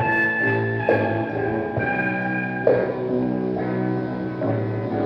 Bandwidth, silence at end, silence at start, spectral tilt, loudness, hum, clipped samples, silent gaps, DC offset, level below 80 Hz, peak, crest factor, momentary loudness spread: 5.8 kHz; 0 s; 0 s; -9.5 dB/octave; -23 LUFS; none; under 0.1%; none; under 0.1%; -54 dBFS; -2 dBFS; 20 dB; 5 LU